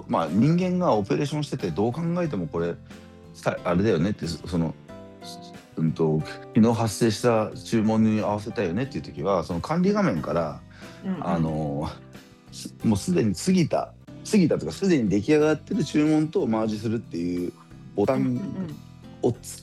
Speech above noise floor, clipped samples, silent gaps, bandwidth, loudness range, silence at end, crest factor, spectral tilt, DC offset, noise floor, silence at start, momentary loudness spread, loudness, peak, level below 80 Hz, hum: 22 dB; under 0.1%; none; 12.5 kHz; 5 LU; 0 s; 16 dB; -6.5 dB/octave; under 0.1%; -46 dBFS; 0 s; 16 LU; -25 LUFS; -8 dBFS; -54 dBFS; none